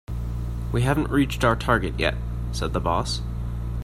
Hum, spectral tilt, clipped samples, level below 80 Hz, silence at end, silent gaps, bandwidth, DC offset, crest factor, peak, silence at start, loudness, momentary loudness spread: none; -6 dB/octave; under 0.1%; -30 dBFS; 0 s; none; 15 kHz; under 0.1%; 18 dB; -6 dBFS; 0.1 s; -25 LUFS; 9 LU